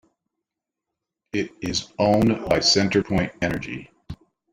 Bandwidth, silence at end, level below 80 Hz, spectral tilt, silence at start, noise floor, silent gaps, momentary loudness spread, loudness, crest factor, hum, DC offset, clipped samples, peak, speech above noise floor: 16 kHz; 0.4 s; -48 dBFS; -4.5 dB/octave; 1.35 s; -85 dBFS; none; 23 LU; -22 LUFS; 20 dB; none; under 0.1%; under 0.1%; -4 dBFS; 63 dB